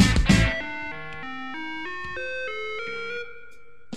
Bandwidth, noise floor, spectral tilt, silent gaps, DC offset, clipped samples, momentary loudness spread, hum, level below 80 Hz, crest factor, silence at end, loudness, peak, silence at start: 14.5 kHz; -53 dBFS; -5 dB/octave; none; 1%; under 0.1%; 15 LU; none; -32 dBFS; 22 dB; 0 s; -27 LUFS; -4 dBFS; 0 s